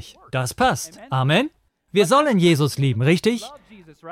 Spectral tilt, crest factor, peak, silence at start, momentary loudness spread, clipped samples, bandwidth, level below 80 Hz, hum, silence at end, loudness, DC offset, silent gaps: -5.5 dB/octave; 14 dB; -6 dBFS; 0.05 s; 12 LU; under 0.1%; 16 kHz; -52 dBFS; none; 0 s; -20 LUFS; under 0.1%; none